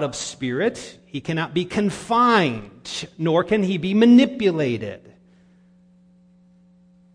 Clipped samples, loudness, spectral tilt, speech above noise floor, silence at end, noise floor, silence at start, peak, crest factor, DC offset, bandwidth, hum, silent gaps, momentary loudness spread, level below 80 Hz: under 0.1%; -20 LUFS; -5.5 dB/octave; 34 dB; 2.15 s; -54 dBFS; 0 s; -4 dBFS; 18 dB; under 0.1%; 10.5 kHz; 60 Hz at -35 dBFS; none; 18 LU; -56 dBFS